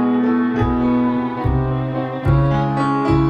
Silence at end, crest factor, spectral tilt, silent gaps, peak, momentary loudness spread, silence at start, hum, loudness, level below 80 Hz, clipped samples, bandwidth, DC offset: 0 s; 14 dB; -9.5 dB/octave; none; -2 dBFS; 5 LU; 0 s; none; -18 LUFS; -30 dBFS; under 0.1%; 8.4 kHz; under 0.1%